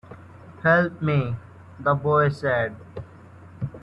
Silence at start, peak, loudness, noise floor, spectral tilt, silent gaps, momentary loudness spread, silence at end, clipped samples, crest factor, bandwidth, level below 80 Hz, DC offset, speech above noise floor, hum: 0.1 s; -8 dBFS; -23 LUFS; -46 dBFS; -8.5 dB/octave; none; 20 LU; 0.05 s; under 0.1%; 18 dB; 8.2 kHz; -56 dBFS; under 0.1%; 24 dB; none